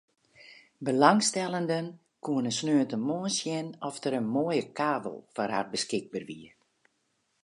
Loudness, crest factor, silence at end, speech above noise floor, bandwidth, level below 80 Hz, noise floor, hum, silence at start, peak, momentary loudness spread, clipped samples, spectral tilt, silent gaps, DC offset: -29 LUFS; 26 dB; 1 s; 47 dB; 11.5 kHz; -78 dBFS; -75 dBFS; none; 0.4 s; -4 dBFS; 15 LU; under 0.1%; -4 dB/octave; none; under 0.1%